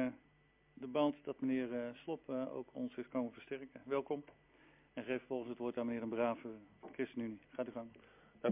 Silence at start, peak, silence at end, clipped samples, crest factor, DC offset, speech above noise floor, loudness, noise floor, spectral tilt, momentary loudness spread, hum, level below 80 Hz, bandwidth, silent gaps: 0 s; -22 dBFS; 0 s; under 0.1%; 20 dB; under 0.1%; 30 dB; -42 LUFS; -71 dBFS; -5 dB/octave; 14 LU; none; -78 dBFS; 3.8 kHz; none